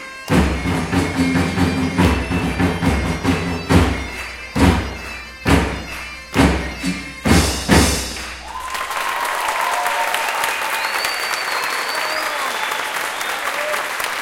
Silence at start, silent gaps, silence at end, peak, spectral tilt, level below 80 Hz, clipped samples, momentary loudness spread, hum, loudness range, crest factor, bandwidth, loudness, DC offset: 0 s; none; 0 s; 0 dBFS; -4.5 dB/octave; -28 dBFS; under 0.1%; 9 LU; none; 2 LU; 18 dB; 17 kHz; -19 LUFS; under 0.1%